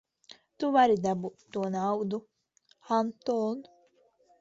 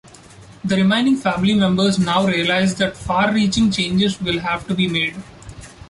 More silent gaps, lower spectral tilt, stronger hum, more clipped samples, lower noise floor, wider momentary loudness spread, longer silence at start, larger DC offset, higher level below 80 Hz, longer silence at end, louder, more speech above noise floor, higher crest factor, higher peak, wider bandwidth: neither; first, -6.5 dB/octave vs -5 dB/octave; neither; neither; first, -68 dBFS vs -42 dBFS; first, 12 LU vs 7 LU; first, 0.6 s vs 0.4 s; neither; second, -72 dBFS vs -44 dBFS; first, 0.8 s vs 0 s; second, -29 LUFS vs -18 LUFS; first, 40 dB vs 25 dB; first, 20 dB vs 14 dB; second, -12 dBFS vs -4 dBFS; second, 7.8 kHz vs 11.5 kHz